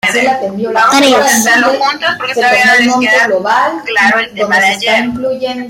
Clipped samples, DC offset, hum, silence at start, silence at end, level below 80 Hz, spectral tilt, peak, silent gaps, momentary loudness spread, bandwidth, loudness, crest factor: under 0.1%; under 0.1%; none; 0.05 s; 0 s; -52 dBFS; -2 dB/octave; 0 dBFS; none; 7 LU; 16.5 kHz; -9 LUFS; 10 dB